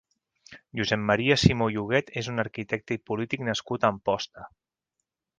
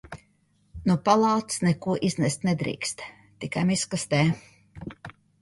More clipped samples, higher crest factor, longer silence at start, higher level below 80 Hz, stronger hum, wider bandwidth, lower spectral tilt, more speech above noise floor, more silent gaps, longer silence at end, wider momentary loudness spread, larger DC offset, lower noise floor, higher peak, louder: neither; about the same, 26 dB vs 22 dB; first, 0.5 s vs 0.05 s; about the same, -50 dBFS vs -54 dBFS; neither; second, 9.8 kHz vs 11.5 kHz; about the same, -5.5 dB/octave vs -5 dB/octave; first, 57 dB vs 41 dB; neither; first, 0.9 s vs 0.3 s; second, 10 LU vs 21 LU; neither; first, -83 dBFS vs -66 dBFS; about the same, -2 dBFS vs -4 dBFS; about the same, -26 LUFS vs -25 LUFS